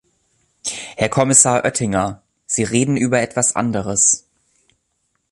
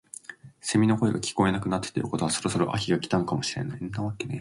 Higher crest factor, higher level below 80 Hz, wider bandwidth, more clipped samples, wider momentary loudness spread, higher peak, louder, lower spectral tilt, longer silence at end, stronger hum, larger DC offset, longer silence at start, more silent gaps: about the same, 20 dB vs 18 dB; first, -48 dBFS vs -54 dBFS; about the same, 12.5 kHz vs 11.5 kHz; neither; first, 14 LU vs 10 LU; first, 0 dBFS vs -10 dBFS; first, -16 LUFS vs -27 LUFS; second, -3.5 dB/octave vs -5 dB/octave; first, 1.15 s vs 0 s; neither; neither; first, 0.65 s vs 0.3 s; neither